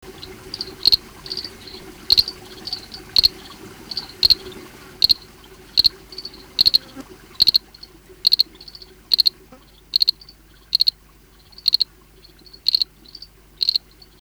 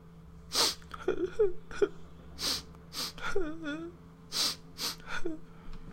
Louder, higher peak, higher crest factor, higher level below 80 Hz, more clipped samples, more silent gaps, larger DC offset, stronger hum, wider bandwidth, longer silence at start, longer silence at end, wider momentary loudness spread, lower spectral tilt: first, -18 LUFS vs -33 LUFS; first, -2 dBFS vs -14 dBFS; about the same, 20 dB vs 20 dB; about the same, -48 dBFS vs -48 dBFS; neither; neither; neither; neither; first, over 20 kHz vs 16 kHz; about the same, 0.05 s vs 0 s; first, 0.45 s vs 0 s; about the same, 22 LU vs 21 LU; second, -1 dB/octave vs -2.5 dB/octave